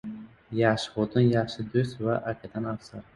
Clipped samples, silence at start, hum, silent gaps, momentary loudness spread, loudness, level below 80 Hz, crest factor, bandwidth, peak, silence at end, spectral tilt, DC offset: under 0.1%; 0.05 s; none; none; 12 LU; -27 LUFS; -58 dBFS; 20 dB; 11.5 kHz; -8 dBFS; 0.15 s; -7 dB/octave; under 0.1%